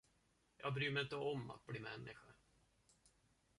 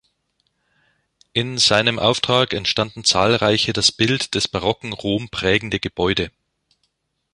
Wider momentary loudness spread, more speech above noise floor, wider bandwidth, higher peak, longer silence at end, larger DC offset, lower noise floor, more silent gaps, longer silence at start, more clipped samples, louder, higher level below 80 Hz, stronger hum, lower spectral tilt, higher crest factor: first, 14 LU vs 8 LU; second, 34 dB vs 51 dB; about the same, 11.5 kHz vs 11.5 kHz; second, -26 dBFS vs -2 dBFS; first, 1.25 s vs 1.05 s; neither; first, -79 dBFS vs -71 dBFS; neither; second, 0.6 s vs 1.35 s; neither; second, -45 LUFS vs -18 LUFS; second, -76 dBFS vs -46 dBFS; neither; first, -6 dB/octave vs -3.5 dB/octave; about the same, 22 dB vs 20 dB